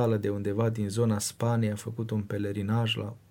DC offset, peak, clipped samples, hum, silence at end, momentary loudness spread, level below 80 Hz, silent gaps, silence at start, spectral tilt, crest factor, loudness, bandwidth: under 0.1%; -14 dBFS; under 0.1%; none; 0.15 s; 5 LU; -64 dBFS; none; 0 s; -6 dB/octave; 16 dB; -29 LUFS; 17 kHz